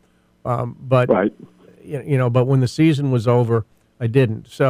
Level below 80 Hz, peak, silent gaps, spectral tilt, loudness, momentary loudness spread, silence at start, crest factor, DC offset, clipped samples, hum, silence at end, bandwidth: -56 dBFS; -4 dBFS; none; -8 dB/octave; -19 LUFS; 12 LU; 0.45 s; 16 dB; under 0.1%; under 0.1%; none; 0 s; 11.5 kHz